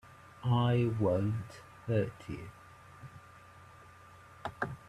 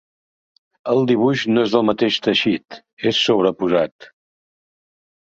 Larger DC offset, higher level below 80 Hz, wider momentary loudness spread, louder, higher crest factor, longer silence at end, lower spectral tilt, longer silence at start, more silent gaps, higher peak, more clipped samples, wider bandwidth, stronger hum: neither; about the same, -62 dBFS vs -60 dBFS; first, 25 LU vs 7 LU; second, -33 LUFS vs -18 LUFS; about the same, 18 dB vs 18 dB; second, 0 s vs 1.25 s; first, -8 dB/octave vs -5.5 dB/octave; second, 0.05 s vs 0.85 s; second, none vs 2.93-2.97 s, 3.92-3.99 s; second, -18 dBFS vs -2 dBFS; neither; first, 11 kHz vs 7.8 kHz; neither